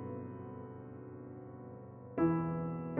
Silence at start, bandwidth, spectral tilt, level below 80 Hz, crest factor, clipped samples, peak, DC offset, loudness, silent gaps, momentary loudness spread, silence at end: 0 s; 3.2 kHz; -11 dB/octave; -66 dBFS; 18 dB; under 0.1%; -20 dBFS; under 0.1%; -39 LUFS; none; 17 LU; 0 s